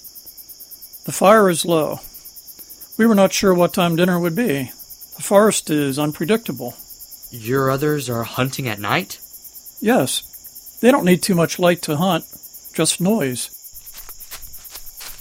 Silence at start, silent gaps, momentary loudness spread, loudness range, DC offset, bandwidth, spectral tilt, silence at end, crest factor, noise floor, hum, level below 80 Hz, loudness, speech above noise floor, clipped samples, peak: 0.05 s; none; 21 LU; 5 LU; under 0.1%; 16.5 kHz; -4.5 dB/octave; 0 s; 20 dB; -40 dBFS; none; -52 dBFS; -18 LUFS; 22 dB; under 0.1%; 0 dBFS